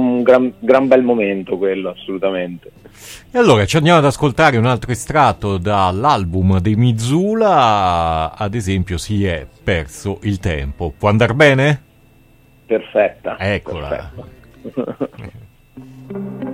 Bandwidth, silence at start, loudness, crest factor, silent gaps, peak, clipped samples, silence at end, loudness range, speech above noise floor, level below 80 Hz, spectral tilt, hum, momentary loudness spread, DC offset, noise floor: 15.5 kHz; 0 s; -16 LUFS; 16 dB; none; 0 dBFS; under 0.1%; 0 s; 8 LU; 33 dB; -38 dBFS; -6 dB/octave; none; 15 LU; under 0.1%; -49 dBFS